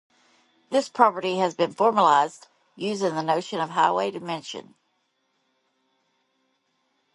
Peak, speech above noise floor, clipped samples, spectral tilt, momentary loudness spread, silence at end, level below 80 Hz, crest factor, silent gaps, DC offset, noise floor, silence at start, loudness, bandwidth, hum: -2 dBFS; 49 dB; under 0.1%; -4.5 dB/octave; 13 LU; 2.5 s; -78 dBFS; 24 dB; none; under 0.1%; -72 dBFS; 0.7 s; -23 LUFS; 11.5 kHz; none